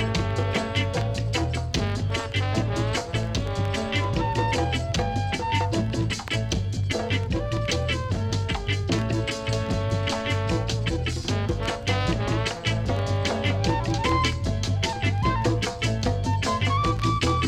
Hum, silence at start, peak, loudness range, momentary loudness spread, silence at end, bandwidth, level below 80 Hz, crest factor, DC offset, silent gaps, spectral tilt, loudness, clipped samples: none; 0 s; -10 dBFS; 2 LU; 3 LU; 0 s; 12 kHz; -36 dBFS; 16 dB; under 0.1%; none; -5.5 dB/octave; -25 LUFS; under 0.1%